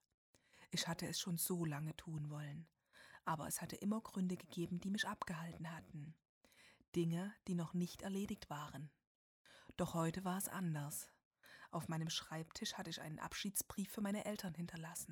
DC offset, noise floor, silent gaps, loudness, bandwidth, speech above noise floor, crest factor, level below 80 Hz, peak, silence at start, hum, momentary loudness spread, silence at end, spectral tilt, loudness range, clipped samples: under 0.1%; -65 dBFS; 6.29-6.41 s, 6.88-6.92 s, 9.07-9.45 s, 11.25-11.31 s; -44 LUFS; 19.5 kHz; 21 dB; 18 dB; -72 dBFS; -26 dBFS; 0.55 s; none; 13 LU; 0 s; -4.5 dB/octave; 1 LU; under 0.1%